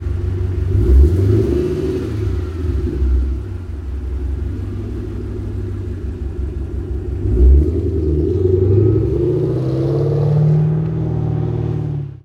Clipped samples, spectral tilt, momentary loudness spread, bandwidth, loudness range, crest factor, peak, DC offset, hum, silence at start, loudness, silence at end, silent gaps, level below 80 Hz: under 0.1%; -10.5 dB/octave; 12 LU; 5.2 kHz; 9 LU; 14 dB; -2 dBFS; under 0.1%; none; 0 s; -18 LUFS; 0.1 s; none; -20 dBFS